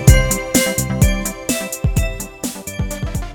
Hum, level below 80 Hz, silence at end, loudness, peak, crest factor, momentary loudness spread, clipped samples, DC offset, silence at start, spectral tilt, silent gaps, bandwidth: none; -22 dBFS; 0 s; -19 LUFS; 0 dBFS; 16 dB; 10 LU; 0.2%; under 0.1%; 0 s; -4.5 dB/octave; none; over 20 kHz